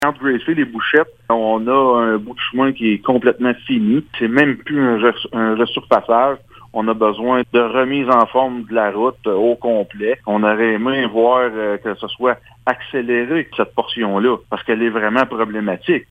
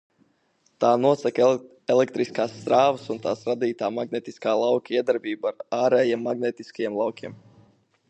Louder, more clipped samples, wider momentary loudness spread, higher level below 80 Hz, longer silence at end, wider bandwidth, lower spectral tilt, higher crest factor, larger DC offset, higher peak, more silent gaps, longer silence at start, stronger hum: first, -17 LUFS vs -24 LUFS; neither; second, 6 LU vs 9 LU; first, -56 dBFS vs -74 dBFS; second, 0.1 s vs 0.75 s; first, 9.6 kHz vs 8.6 kHz; first, -7 dB/octave vs -5.5 dB/octave; about the same, 16 dB vs 18 dB; neither; first, 0 dBFS vs -6 dBFS; neither; second, 0 s vs 0.8 s; neither